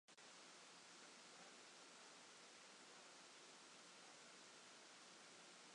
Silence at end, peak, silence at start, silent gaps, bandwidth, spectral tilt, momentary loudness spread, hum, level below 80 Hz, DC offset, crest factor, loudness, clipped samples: 0 s; -50 dBFS; 0.1 s; none; 11 kHz; -0.5 dB/octave; 1 LU; none; under -90 dBFS; under 0.1%; 14 dB; -62 LUFS; under 0.1%